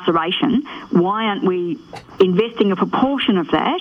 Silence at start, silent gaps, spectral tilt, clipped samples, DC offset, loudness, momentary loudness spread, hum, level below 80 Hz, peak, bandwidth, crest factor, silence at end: 0 s; none; -7.5 dB/octave; under 0.1%; under 0.1%; -18 LUFS; 6 LU; none; -54 dBFS; -2 dBFS; 6.6 kHz; 14 dB; 0 s